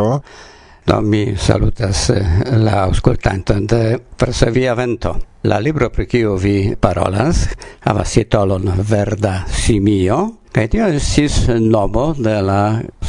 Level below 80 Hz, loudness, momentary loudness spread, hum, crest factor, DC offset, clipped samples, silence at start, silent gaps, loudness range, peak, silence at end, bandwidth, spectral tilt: -26 dBFS; -16 LUFS; 5 LU; none; 14 dB; under 0.1%; 0.1%; 0 s; none; 1 LU; 0 dBFS; 0 s; 11 kHz; -6 dB/octave